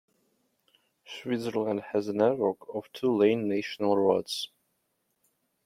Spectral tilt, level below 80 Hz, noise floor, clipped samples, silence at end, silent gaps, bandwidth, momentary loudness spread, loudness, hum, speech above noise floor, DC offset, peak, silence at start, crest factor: -5.5 dB/octave; -74 dBFS; -77 dBFS; under 0.1%; 1.2 s; none; 15.5 kHz; 13 LU; -28 LUFS; none; 49 dB; under 0.1%; -10 dBFS; 1.1 s; 20 dB